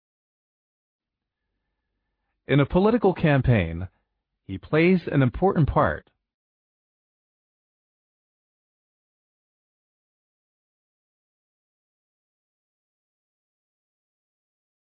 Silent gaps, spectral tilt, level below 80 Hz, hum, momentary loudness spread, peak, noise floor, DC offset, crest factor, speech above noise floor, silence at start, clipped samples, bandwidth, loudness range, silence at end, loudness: none; -11 dB/octave; -46 dBFS; none; 16 LU; -8 dBFS; -85 dBFS; under 0.1%; 20 dB; 64 dB; 2.45 s; under 0.1%; 4.9 kHz; 6 LU; 8.85 s; -22 LUFS